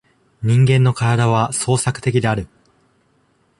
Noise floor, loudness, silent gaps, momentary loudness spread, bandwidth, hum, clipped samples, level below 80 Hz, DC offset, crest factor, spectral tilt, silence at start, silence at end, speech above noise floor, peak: -60 dBFS; -17 LUFS; none; 10 LU; 11.5 kHz; none; under 0.1%; -46 dBFS; under 0.1%; 16 dB; -5.5 dB/octave; 0.4 s; 1.15 s; 44 dB; -2 dBFS